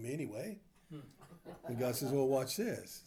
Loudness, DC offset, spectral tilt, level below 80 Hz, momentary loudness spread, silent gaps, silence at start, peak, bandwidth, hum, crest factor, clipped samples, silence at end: -37 LUFS; under 0.1%; -5 dB/octave; -72 dBFS; 21 LU; none; 0 s; -22 dBFS; over 20 kHz; none; 18 dB; under 0.1%; 0.05 s